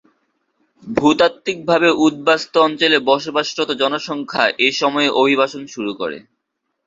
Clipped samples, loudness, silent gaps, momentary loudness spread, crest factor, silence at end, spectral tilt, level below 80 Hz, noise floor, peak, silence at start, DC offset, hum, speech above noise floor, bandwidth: under 0.1%; -16 LUFS; none; 10 LU; 18 dB; 0.7 s; -4 dB/octave; -60 dBFS; -74 dBFS; 0 dBFS; 0.85 s; under 0.1%; none; 58 dB; 7.8 kHz